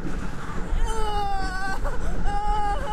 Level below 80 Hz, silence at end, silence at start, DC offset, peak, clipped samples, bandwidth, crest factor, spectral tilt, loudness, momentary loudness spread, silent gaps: -26 dBFS; 0 s; 0 s; under 0.1%; -10 dBFS; under 0.1%; 10.5 kHz; 12 dB; -5 dB/octave; -29 LUFS; 7 LU; none